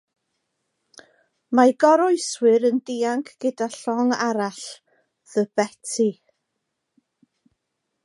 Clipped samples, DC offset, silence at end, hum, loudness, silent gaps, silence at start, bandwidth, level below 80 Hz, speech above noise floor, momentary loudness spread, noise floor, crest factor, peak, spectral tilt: under 0.1%; under 0.1%; 1.9 s; none; -21 LUFS; none; 1.5 s; 11.5 kHz; -80 dBFS; 58 dB; 11 LU; -79 dBFS; 20 dB; -2 dBFS; -4 dB/octave